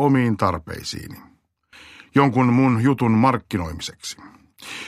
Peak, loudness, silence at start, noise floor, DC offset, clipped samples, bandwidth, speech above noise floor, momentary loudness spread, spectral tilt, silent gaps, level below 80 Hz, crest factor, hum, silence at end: -2 dBFS; -20 LUFS; 0 s; -53 dBFS; under 0.1%; under 0.1%; 14.5 kHz; 33 dB; 18 LU; -6.5 dB/octave; none; -48 dBFS; 18 dB; none; 0 s